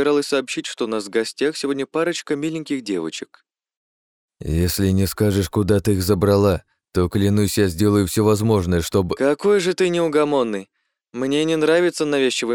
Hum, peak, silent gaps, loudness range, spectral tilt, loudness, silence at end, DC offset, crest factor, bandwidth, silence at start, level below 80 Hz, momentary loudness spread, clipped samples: none; -4 dBFS; 3.77-4.29 s; 6 LU; -5.5 dB/octave; -20 LUFS; 0 s; under 0.1%; 16 dB; 18 kHz; 0 s; -42 dBFS; 9 LU; under 0.1%